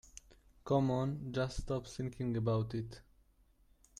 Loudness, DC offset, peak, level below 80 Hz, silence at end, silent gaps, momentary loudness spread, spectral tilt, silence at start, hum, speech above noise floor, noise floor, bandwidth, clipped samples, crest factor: -37 LUFS; under 0.1%; -20 dBFS; -54 dBFS; 1 s; none; 22 LU; -7 dB/octave; 0.15 s; none; 33 dB; -69 dBFS; 11.5 kHz; under 0.1%; 18 dB